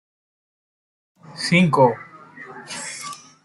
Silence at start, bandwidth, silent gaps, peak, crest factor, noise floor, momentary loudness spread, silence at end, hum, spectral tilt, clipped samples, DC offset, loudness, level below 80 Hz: 1.3 s; 12 kHz; none; -2 dBFS; 22 dB; -41 dBFS; 24 LU; 0.3 s; none; -5.5 dB/octave; under 0.1%; under 0.1%; -19 LUFS; -62 dBFS